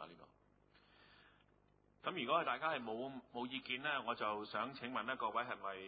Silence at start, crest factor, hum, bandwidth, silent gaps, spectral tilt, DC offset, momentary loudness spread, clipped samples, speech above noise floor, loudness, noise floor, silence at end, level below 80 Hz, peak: 0 s; 20 dB; 50 Hz at -80 dBFS; 4.8 kHz; none; -1 dB/octave; under 0.1%; 9 LU; under 0.1%; 31 dB; -42 LUFS; -73 dBFS; 0 s; -80 dBFS; -24 dBFS